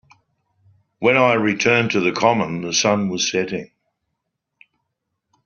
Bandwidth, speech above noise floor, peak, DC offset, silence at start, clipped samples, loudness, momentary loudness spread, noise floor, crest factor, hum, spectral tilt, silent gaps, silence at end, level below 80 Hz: 7.2 kHz; 59 dB; -2 dBFS; under 0.1%; 1 s; under 0.1%; -18 LUFS; 7 LU; -77 dBFS; 18 dB; none; -3 dB/octave; none; 1.8 s; -60 dBFS